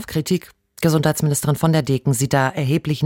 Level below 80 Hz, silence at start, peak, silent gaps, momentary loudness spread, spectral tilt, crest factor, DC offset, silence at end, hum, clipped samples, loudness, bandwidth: -50 dBFS; 0 s; -2 dBFS; none; 4 LU; -5.5 dB/octave; 16 dB; under 0.1%; 0 s; none; under 0.1%; -19 LUFS; 17 kHz